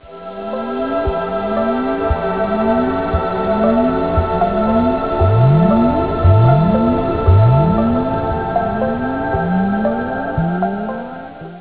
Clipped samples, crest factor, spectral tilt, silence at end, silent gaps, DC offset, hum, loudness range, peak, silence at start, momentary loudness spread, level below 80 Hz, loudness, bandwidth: under 0.1%; 14 dB; -12 dB/octave; 0 s; none; 0.7%; none; 5 LU; 0 dBFS; 0.05 s; 9 LU; -26 dBFS; -16 LUFS; 4 kHz